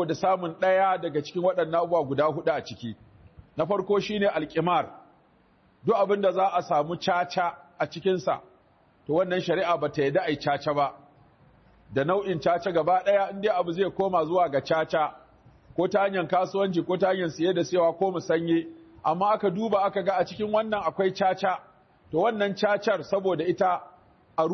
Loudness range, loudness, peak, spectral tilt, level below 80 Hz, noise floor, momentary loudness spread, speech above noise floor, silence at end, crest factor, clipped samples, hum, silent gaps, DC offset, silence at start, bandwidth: 2 LU; -26 LUFS; -12 dBFS; -6 dB/octave; -64 dBFS; -61 dBFS; 7 LU; 36 dB; 0 s; 14 dB; under 0.1%; none; none; under 0.1%; 0 s; 6.4 kHz